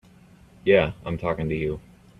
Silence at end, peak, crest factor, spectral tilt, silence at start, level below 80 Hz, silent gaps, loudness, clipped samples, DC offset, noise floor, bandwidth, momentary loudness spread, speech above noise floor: 0.4 s; -4 dBFS; 22 dB; -8 dB/octave; 0.65 s; -46 dBFS; none; -24 LUFS; under 0.1%; under 0.1%; -52 dBFS; 5.8 kHz; 10 LU; 29 dB